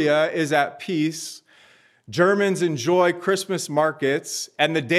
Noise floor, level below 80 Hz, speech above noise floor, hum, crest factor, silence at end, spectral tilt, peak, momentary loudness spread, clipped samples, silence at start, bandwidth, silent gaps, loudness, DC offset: -55 dBFS; -78 dBFS; 34 dB; none; 18 dB; 0 s; -4.5 dB/octave; -4 dBFS; 10 LU; under 0.1%; 0 s; 14.5 kHz; none; -22 LUFS; under 0.1%